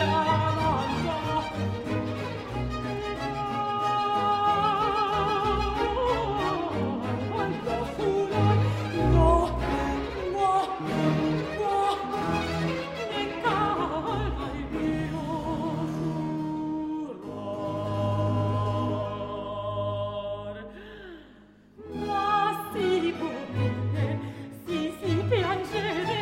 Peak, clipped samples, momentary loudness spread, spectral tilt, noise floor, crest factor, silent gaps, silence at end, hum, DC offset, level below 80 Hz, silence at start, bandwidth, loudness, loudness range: -10 dBFS; under 0.1%; 9 LU; -7 dB/octave; -53 dBFS; 18 dB; none; 0 s; none; under 0.1%; -40 dBFS; 0 s; 15.5 kHz; -28 LUFS; 6 LU